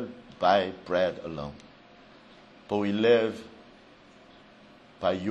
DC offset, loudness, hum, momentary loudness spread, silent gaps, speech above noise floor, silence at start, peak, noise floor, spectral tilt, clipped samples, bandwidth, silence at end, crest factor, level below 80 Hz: under 0.1%; -27 LUFS; none; 18 LU; none; 28 dB; 0 s; -8 dBFS; -54 dBFS; -6.5 dB/octave; under 0.1%; 8.4 kHz; 0 s; 22 dB; -62 dBFS